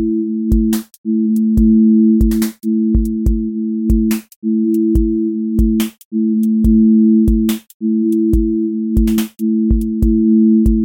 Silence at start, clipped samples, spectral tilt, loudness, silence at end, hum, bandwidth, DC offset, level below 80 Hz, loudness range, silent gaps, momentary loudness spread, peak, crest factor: 0 s; under 0.1%; -8 dB/octave; -14 LUFS; 0 s; none; 17 kHz; under 0.1%; -22 dBFS; 2 LU; 0.98-1.04 s, 4.36-4.42 s, 6.05-6.11 s, 7.74-7.80 s; 8 LU; -2 dBFS; 12 dB